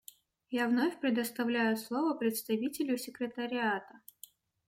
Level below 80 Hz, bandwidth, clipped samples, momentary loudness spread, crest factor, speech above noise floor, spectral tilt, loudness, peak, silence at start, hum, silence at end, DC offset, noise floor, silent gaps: -82 dBFS; 16.5 kHz; under 0.1%; 8 LU; 16 dB; 25 dB; -4 dB/octave; -33 LUFS; -18 dBFS; 0.5 s; none; 0.7 s; under 0.1%; -58 dBFS; none